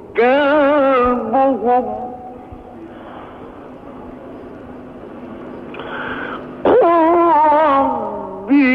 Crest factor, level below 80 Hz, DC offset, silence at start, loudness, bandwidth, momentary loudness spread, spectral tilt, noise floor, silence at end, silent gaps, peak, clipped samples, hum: 12 dB; -46 dBFS; under 0.1%; 0 s; -14 LUFS; 5.4 kHz; 23 LU; -7.5 dB/octave; -35 dBFS; 0 s; none; -4 dBFS; under 0.1%; none